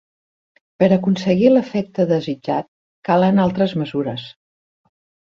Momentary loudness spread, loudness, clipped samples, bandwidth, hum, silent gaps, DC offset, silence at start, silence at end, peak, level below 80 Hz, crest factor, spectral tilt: 11 LU; -18 LUFS; under 0.1%; 7 kHz; none; 2.68-3.02 s; under 0.1%; 0.8 s; 0.95 s; -2 dBFS; -56 dBFS; 18 dB; -8 dB/octave